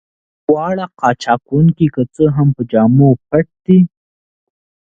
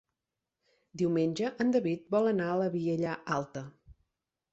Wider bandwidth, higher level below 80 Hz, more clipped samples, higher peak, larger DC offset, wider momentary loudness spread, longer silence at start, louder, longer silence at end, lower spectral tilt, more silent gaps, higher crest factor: about the same, 7.6 kHz vs 8.2 kHz; first, -46 dBFS vs -68 dBFS; neither; first, 0 dBFS vs -16 dBFS; neither; second, 6 LU vs 13 LU; second, 0.5 s vs 0.95 s; first, -14 LUFS vs -31 LUFS; first, 1.1 s vs 0.6 s; first, -9 dB/octave vs -7 dB/octave; neither; about the same, 14 dB vs 16 dB